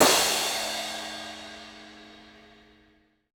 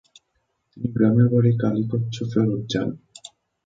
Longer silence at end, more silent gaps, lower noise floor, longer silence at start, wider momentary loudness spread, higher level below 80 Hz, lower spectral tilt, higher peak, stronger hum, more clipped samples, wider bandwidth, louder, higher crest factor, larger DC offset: first, 1.05 s vs 0.4 s; neither; second, -63 dBFS vs -72 dBFS; second, 0 s vs 0.75 s; first, 25 LU vs 17 LU; second, -62 dBFS vs -56 dBFS; second, -0.5 dB/octave vs -8 dB/octave; about the same, -6 dBFS vs -6 dBFS; first, 60 Hz at -75 dBFS vs none; neither; first, over 20 kHz vs 7.8 kHz; second, -26 LUFS vs -22 LUFS; first, 24 dB vs 18 dB; neither